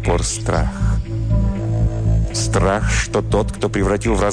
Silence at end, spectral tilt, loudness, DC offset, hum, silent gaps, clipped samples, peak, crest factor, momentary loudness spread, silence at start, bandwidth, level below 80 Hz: 0 s; -5.5 dB/octave; -19 LUFS; 0.6%; none; none; under 0.1%; -4 dBFS; 12 dB; 4 LU; 0 s; 10 kHz; -22 dBFS